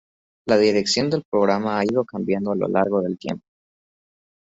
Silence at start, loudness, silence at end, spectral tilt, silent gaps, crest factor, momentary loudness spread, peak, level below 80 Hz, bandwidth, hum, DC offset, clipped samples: 0.45 s; -21 LUFS; 1.05 s; -5 dB/octave; 1.25-1.32 s; 18 dB; 11 LU; -4 dBFS; -60 dBFS; 8 kHz; none; under 0.1%; under 0.1%